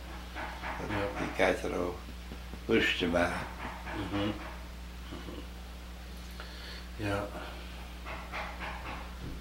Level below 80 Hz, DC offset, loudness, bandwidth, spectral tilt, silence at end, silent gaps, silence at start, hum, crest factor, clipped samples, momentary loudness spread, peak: -44 dBFS; under 0.1%; -35 LUFS; 16 kHz; -5 dB/octave; 0 s; none; 0 s; none; 24 dB; under 0.1%; 16 LU; -12 dBFS